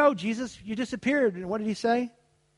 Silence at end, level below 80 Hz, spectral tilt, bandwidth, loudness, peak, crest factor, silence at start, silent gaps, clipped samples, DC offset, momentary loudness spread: 0.5 s; -64 dBFS; -5.5 dB/octave; 11.5 kHz; -28 LUFS; -10 dBFS; 18 dB; 0 s; none; under 0.1%; under 0.1%; 9 LU